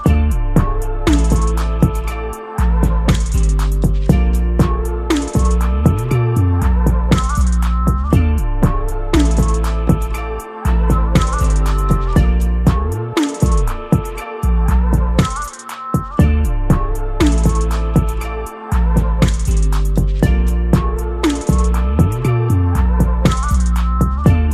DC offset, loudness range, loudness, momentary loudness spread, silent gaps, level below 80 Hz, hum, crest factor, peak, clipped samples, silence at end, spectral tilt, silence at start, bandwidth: under 0.1%; 1 LU; -16 LUFS; 6 LU; none; -16 dBFS; none; 12 dB; -2 dBFS; under 0.1%; 0 s; -7 dB/octave; 0 s; 14 kHz